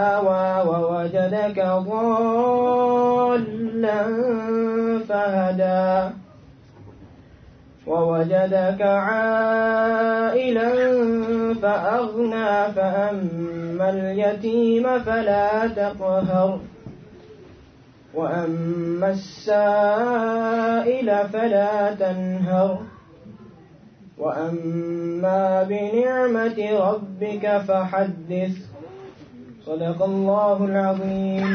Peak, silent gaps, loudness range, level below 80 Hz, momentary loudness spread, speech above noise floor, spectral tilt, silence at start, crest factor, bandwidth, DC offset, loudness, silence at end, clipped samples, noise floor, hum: -8 dBFS; none; 5 LU; -58 dBFS; 8 LU; 29 dB; -8 dB/octave; 0 s; 12 dB; 6.6 kHz; under 0.1%; -21 LUFS; 0 s; under 0.1%; -49 dBFS; none